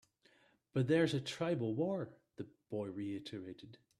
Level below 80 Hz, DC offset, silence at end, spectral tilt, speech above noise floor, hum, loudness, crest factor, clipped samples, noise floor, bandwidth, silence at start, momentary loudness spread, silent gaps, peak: -76 dBFS; under 0.1%; 0.25 s; -6.5 dB/octave; 33 dB; none; -38 LUFS; 20 dB; under 0.1%; -71 dBFS; 12.5 kHz; 0.75 s; 19 LU; none; -20 dBFS